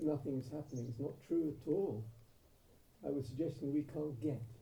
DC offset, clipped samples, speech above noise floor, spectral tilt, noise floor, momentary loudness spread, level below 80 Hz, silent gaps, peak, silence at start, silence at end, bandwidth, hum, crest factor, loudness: under 0.1%; under 0.1%; 26 dB; -9 dB/octave; -66 dBFS; 7 LU; -68 dBFS; none; -24 dBFS; 0 s; 0 s; over 20 kHz; none; 16 dB; -41 LUFS